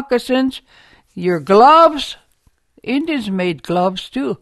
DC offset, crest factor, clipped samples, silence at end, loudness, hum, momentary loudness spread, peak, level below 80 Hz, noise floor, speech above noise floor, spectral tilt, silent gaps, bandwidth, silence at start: under 0.1%; 16 dB; under 0.1%; 0.05 s; -15 LUFS; none; 17 LU; 0 dBFS; -52 dBFS; -58 dBFS; 43 dB; -6 dB/octave; none; 12.5 kHz; 0 s